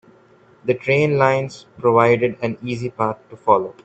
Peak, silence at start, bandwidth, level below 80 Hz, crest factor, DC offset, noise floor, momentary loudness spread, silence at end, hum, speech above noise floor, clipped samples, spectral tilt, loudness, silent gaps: 0 dBFS; 0.65 s; 8.2 kHz; -58 dBFS; 18 dB; under 0.1%; -51 dBFS; 11 LU; 0.15 s; none; 33 dB; under 0.1%; -7 dB/octave; -19 LUFS; none